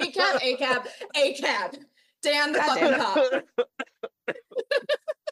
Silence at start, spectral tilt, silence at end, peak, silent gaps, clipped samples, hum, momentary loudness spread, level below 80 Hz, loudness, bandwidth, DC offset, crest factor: 0 s; -2 dB/octave; 0 s; -10 dBFS; none; under 0.1%; none; 13 LU; -88 dBFS; -25 LUFS; 12.5 kHz; under 0.1%; 16 dB